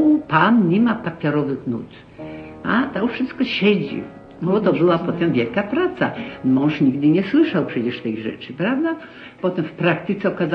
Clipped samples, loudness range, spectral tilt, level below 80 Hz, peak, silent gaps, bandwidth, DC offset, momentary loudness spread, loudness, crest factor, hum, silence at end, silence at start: under 0.1%; 3 LU; -9 dB/octave; -56 dBFS; -2 dBFS; none; 6 kHz; under 0.1%; 13 LU; -20 LUFS; 16 dB; none; 0 s; 0 s